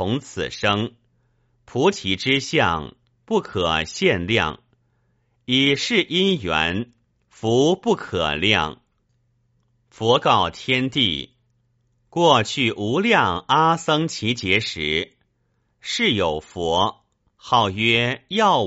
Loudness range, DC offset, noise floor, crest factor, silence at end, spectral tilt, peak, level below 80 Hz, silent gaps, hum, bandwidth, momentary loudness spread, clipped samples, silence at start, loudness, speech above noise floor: 3 LU; under 0.1%; -68 dBFS; 20 dB; 0 s; -2.5 dB/octave; 0 dBFS; -50 dBFS; none; none; 8 kHz; 11 LU; under 0.1%; 0 s; -20 LUFS; 48 dB